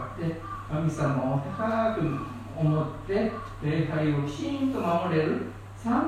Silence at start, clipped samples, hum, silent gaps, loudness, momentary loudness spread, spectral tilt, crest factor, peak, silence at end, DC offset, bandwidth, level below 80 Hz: 0 s; under 0.1%; none; none; -28 LUFS; 7 LU; -8 dB/octave; 16 dB; -12 dBFS; 0 s; under 0.1%; 10 kHz; -48 dBFS